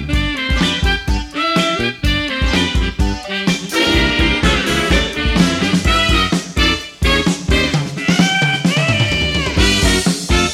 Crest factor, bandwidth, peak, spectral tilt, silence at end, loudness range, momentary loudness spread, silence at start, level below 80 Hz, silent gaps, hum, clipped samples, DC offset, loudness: 16 dB; 15.5 kHz; 0 dBFS; -4 dB/octave; 0 s; 2 LU; 5 LU; 0 s; -22 dBFS; none; none; under 0.1%; under 0.1%; -15 LUFS